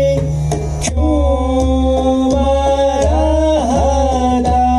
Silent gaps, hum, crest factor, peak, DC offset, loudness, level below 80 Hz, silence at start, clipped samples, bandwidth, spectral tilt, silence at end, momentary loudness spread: none; none; 10 dB; -2 dBFS; under 0.1%; -14 LUFS; -20 dBFS; 0 s; under 0.1%; 11.5 kHz; -6.5 dB/octave; 0 s; 4 LU